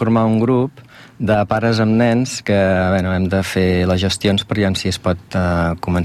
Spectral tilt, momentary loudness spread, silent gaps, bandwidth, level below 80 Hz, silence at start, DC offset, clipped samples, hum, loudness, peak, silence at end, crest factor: -6 dB/octave; 5 LU; none; 14.5 kHz; -40 dBFS; 0 s; under 0.1%; under 0.1%; none; -17 LUFS; -4 dBFS; 0 s; 12 dB